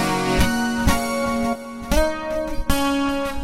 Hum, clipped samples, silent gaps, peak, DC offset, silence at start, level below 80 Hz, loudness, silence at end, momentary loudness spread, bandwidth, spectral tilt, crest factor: none; under 0.1%; none; -4 dBFS; under 0.1%; 0 s; -28 dBFS; -22 LUFS; 0 s; 6 LU; 16.5 kHz; -4.5 dB/octave; 16 dB